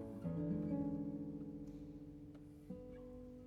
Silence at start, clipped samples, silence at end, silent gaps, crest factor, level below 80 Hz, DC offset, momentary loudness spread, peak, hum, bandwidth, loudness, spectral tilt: 0 s; under 0.1%; 0 s; none; 16 dB; -64 dBFS; under 0.1%; 14 LU; -30 dBFS; none; 6.8 kHz; -46 LUFS; -10.5 dB/octave